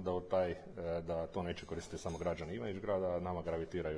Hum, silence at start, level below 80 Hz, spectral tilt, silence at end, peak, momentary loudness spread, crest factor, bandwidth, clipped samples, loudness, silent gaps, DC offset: none; 0 s; -58 dBFS; -6.5 dB/octave; 0 s; -22 dBFS; 7 LU; 16 dB; 10.5 kHz; under 0.1%; -40 LUFS; none; under 0.1%